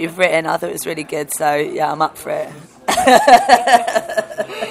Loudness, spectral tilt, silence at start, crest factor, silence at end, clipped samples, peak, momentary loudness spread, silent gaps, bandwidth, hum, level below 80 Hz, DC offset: -15 LUFS; -3 dB/octave; 0 s; 16 dB; 0 s; 0.3%; 0 dBFS; 15 LU; none; 16 kHz; none; -52 dBFS; under 0.1%